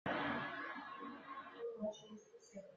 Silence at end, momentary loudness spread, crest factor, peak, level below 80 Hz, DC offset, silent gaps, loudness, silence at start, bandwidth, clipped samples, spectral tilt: 0 s; 17 LU; 18 dB; -28 dBFS; -84 dBFS; under 0.1%; none; -46 LUFS; 0.05 s; 7.6 kHz; under 0.1%; -3 dB/octave